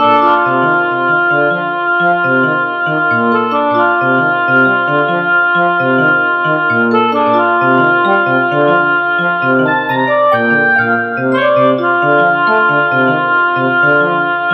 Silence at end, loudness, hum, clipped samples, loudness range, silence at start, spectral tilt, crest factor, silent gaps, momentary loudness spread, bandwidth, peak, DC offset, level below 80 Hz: 0 s; -11 LUFS; none; under 0.1%; 1 LU; 0 s; -8 dB/octave; 10 dB; none; 3 LU; 5.8 kHz; 0 dBFS; under 0.1%; -60 dBFS